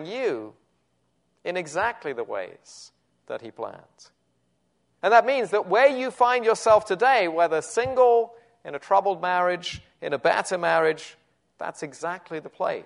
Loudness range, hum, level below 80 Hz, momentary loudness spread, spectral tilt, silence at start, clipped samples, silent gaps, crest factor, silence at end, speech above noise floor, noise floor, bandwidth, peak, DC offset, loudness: 12 LU; none; -66 dBFS; 18 LU; -3.5 dB/octave; 0 s; under 0.1%; none; 20 dB; 0 s; 47 dB; -71 dBFS; 11 kHz; -4 dBFS; under 0.1%; -23 LUFS